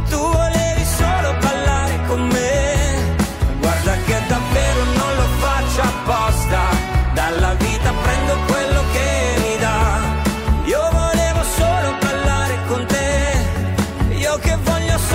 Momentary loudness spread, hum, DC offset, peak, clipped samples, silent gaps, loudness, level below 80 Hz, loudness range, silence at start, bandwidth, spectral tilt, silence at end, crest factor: 2 LU; none; under 0.1%; -6 dBFS; under 0.1%; none; -18 LUFS; -22 dBFS; 1 LU; 0 s; 16 kHz; -5 dB/octave; 0 s; 10 dB